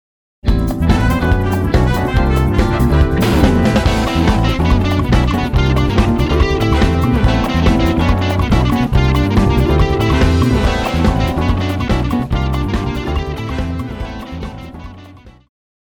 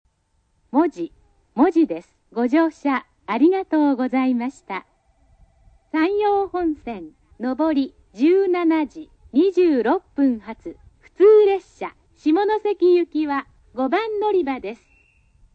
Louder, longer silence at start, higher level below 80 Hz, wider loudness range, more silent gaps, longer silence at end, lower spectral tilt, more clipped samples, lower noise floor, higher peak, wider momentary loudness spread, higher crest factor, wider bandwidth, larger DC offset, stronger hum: first, -15 LUFS vs -20 LUFS; second, 0.45 s vs 0.75 s; first, -18 dBFS vs -56 dBFS; about the same, 6 LU vs 5 LU; neither; second, 0.65 s vs 0.8 s; about the same, -7 dB/octave vs -6.5 dB/octave; neither; second, -38 dBFS vs -66 dBFS; first, 0 dBFS vs -6 dBFS; second, 8 LU vs 15 LU; about the same, 14 dB vs 16 dB; first, 19.5 kHz vs 8 kHz; neither; neither